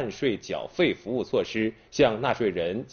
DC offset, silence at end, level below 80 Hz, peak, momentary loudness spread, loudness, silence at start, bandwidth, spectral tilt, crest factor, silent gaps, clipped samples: under 0.1%; 0.05 s; -56 dBFS; -10 dBFS; 7 LU; -27 LUFS; 0 s; 6.8 kHz; -4 dB/octave; 18 dB; none; under 0.1%